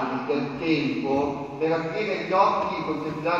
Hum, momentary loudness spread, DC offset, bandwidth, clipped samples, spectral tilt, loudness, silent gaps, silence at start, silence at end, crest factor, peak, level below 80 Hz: none; 7 LU; under 0.1%; 7.6 kHz; under 0.1%; -6.5 dB/octave; -25 LUFS; none; 0 s; 0 s; 18 dB; -6 dBFS; -58 dBFS